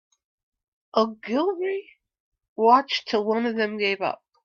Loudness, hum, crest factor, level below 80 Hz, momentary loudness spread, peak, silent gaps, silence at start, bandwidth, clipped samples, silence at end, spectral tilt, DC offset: -24 LUFS; none; 20 dB; -74 dBFS; 11 LU; -4 dBFS; 2.20-2.32 s, 2.48-2.56 s; 0.95 s; 7.2 kHz; under 0.1%; 0.3 s; -5 dB/octave; under 0.1%